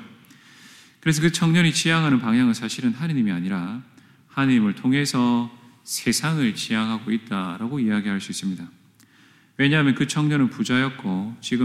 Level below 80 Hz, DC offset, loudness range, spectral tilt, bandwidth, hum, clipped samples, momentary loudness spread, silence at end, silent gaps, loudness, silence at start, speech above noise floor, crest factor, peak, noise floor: -64 dBFS; under 0.1%; 4 LU; -5 dB/octave; 15 kHz; none; under 0.1%; 10 LU; 0 s; none; -22 LUFS; 0 s; 33 dB; 16 dB; -6 dBFS; -55 dBFS